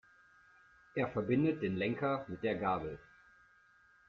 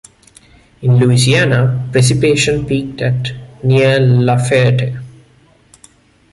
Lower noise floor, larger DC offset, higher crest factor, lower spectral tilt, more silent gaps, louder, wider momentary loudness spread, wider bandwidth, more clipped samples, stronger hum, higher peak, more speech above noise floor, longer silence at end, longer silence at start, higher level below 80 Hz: first, -66 dBFS vs -49 dBFS; neither; about the same, 18 dB vs 14 dB; about the same, -6 dB/octave vs -5.5 dB/octave; neither; second, -36 LUFS vs -13 LUFS; about the same, 10 LU vs 10 LU; second, 6.8 kHz vs 11.5 kHz; neither; neither; second, -20 dBFS vs 0 dBFS; second, 32 dB vs 37 dB; about the same, 1.1 s vs 1.2 s; first, 0.95 s vs 0.8 s; second, -66 dBFS vs -42 dBFS